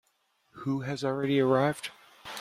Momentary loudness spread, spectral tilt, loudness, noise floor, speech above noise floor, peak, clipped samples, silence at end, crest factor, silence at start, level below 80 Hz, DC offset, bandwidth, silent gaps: 17 LU; -6.5 dB/octave; -29 LUFS; -72 dBFS; 45 dB; -12 dBFS; under 0.1%; 0 s; 18 dB; 0.55 s; -70 dBFS; under 0.1%; 15 kHz; none